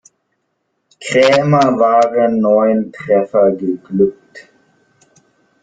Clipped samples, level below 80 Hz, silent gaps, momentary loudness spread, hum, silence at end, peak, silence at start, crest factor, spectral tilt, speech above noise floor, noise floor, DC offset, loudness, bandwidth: under 0.1%; -58 dBFS; none; 7 LU; none; 1.2 s; -2 dBFS; 1 s; 14 dB; -6.5 dB/octave; 55 dB; -68 dBFS; under 0.1%; -13 LUFS; 9.2 kHz